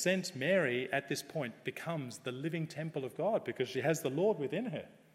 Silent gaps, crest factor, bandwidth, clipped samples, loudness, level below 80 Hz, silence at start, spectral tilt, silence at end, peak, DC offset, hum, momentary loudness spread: none; 18 dB; 16.5 kHz; under 0.1%; -36 LUFS; -82 dBFS; 0 s; -5 dB/octave; 0.25 s; -16 dBFS; under 0.1%; none; 9 LU